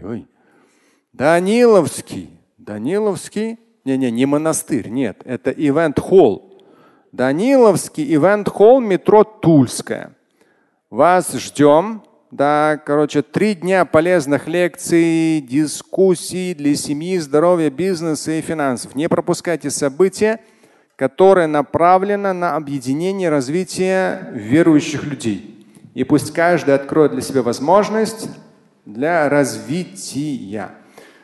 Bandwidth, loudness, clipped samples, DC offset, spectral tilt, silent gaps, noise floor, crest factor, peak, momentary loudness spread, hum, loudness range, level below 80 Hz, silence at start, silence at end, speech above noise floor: 12.5 kHz; -16 LUFS; under 0.1%; under 0.1%; -5.5 dB/octave; none; -58 dBFS; 16 dB; 0 dBFS; 13 LU; none; 5 LU; -54 dBFS; 0 s; 0.5 s; 43 dB